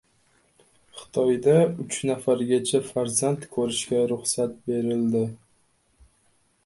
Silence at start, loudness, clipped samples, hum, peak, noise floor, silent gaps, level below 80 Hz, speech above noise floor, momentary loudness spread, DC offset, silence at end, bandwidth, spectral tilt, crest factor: 0.95 s; -24 LUFS; under 0.1%; none; -8 dBFS; -65 dBFS; none; -64 dBFS; 42 dB; 8 LU; under 0.1%; 1.3 s; 12 kHz; -5 dB/octave; 18 dB